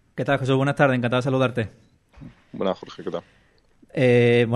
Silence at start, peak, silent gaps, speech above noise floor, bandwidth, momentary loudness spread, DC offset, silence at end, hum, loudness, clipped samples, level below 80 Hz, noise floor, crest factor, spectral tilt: 0.15 s; -6 dBFS; none; 36 dB; 10.5 kHz; 16 LU; under 0.1%; 0 s; none; -22 LUFS; under 0.1%; -56 dBFS; -57 dBFS; 18 dB; -7.5 dB/octave